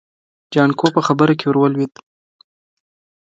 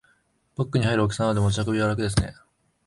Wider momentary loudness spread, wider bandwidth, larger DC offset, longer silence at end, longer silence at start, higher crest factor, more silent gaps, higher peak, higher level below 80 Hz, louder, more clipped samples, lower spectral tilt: about the same, 7 LU vs 9 LU; second, 7.8 kHz vs 11.5 kHz; neither; first, 1.35 s vs 0.55 s; about the same, 0.5 s vs 0.6 s; about the same, 18 dB vs 18 dB; neither; first, 0 dBFS vs -6 dBFS; second, -64 dBFS vs -42 dBFS; first, -16 LUFS vs -24 LUFS; neither; about the same, -7 dB/octave vs -6 dB/octave